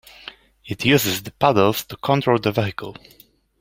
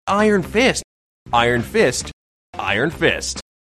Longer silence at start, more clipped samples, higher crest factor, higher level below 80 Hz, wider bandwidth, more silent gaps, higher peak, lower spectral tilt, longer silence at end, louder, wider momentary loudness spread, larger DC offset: first, 0.65 s vs 0.05 s; neither; about the same, 20 dB vs 18 dB; second, -54 dBFS vs -42 dBFS; first, 16.5 kHz vs 13.5 kHz; second, none vs 0.84-1.26 s, 2.13-2.53 s; about the same, -2 dBFS vs -2 dBFS; about the same, -5 dB/octave vs -4 dB/octave; first, 0.65 s vs 0.2 s; about the same, -19 LUFS vs -18 LUFS; first, 20 LU vs 10 LU; neither